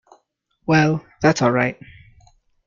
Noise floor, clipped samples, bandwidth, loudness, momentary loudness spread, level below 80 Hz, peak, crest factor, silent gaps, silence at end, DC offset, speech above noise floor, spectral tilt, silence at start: -66 dBFS; under 0.1%; 7.4 kHz; -19 LUFS; 13 LU; -52 dBFS; -2 dBFS; 20 dB; none; 0.95 s; under 0.1%; 49 dB; -6 dB/octave; 0.7 s